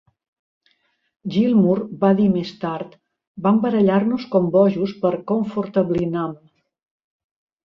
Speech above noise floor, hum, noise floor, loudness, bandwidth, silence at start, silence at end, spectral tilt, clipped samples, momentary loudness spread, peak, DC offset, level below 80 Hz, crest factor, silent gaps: 46 dB; none; -65 dBFS; -19 LUFS; 6.2 kHz; 1.25 s; 1.3 s; -9.5 dB/octave; under 0.1%; 11 LU; -4 dBFS; under 0.1%; -58 dBFS; 16 dB; 3.27-3.35 s